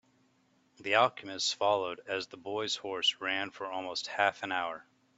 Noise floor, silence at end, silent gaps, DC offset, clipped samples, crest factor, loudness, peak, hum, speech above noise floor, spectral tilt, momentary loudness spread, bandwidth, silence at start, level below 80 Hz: -70 dBFS; 0.35 s; none; under 0.1%; under 0.1%; 24 dB; -32 LUFS; -10 dBFS; none; 37 dB; -2 dB/octave; 11 LU; 8.2 kHz; 0.8 s; -80 dBFS